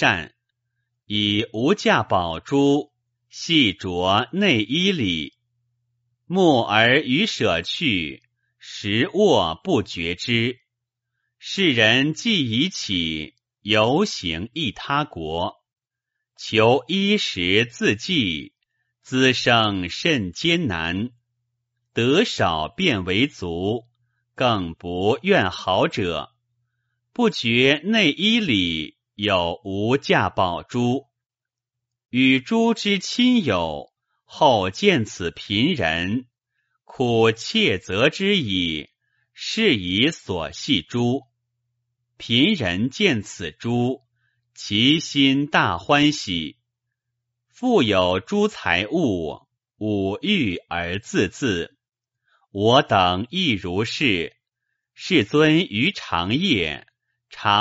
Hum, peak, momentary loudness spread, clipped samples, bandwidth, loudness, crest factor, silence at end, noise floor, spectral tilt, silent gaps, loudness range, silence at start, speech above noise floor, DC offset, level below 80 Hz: none; 0 dBFS; 11 LU; under 0.1%; 8 kHz; -20 LUFS; 20 dB; 0 s; -89 dBFS; -3 dB/octave; none; 3 LU; 0 s; 68 dB; under 0.1%; -52 dBFS